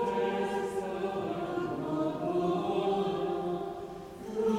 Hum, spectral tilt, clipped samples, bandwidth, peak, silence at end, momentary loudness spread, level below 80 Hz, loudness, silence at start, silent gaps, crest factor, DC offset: none; -7 dB/octave; under 0.1%; 15.5 kHz; -18 dBFS; 0 s; 8 LU; -62 dBFS; -33 LUFS; 0 s; none; 14 dB; under 0.1%